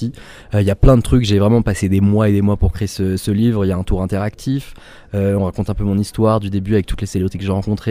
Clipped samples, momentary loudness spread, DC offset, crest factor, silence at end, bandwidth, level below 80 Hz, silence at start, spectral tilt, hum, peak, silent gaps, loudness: under 0.1%; 8 LU; under 0.1%; 16 dB; 0 s; 16 kHz; -26 dBFS; 0 s; -7.5 dB/octave; none; 0 dBFS; none; -17 LUFS